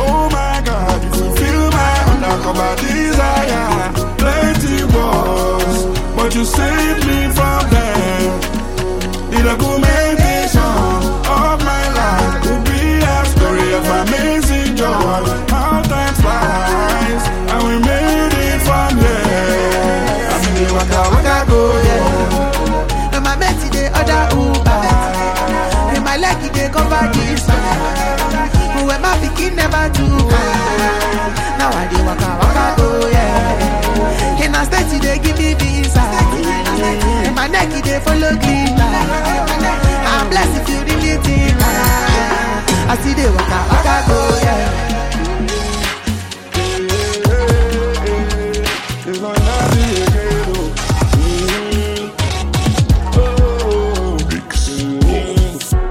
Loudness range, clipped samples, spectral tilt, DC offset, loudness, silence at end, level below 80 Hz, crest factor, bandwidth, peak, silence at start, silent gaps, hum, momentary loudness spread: 2 LU; under 0.1%; -5 dB/octave; under 0.1%; -14 LUFS; 0 s; -18 dBFS; 12 dB; 17 kHz; 0 dBFS; 0 s; none; none; 5 LU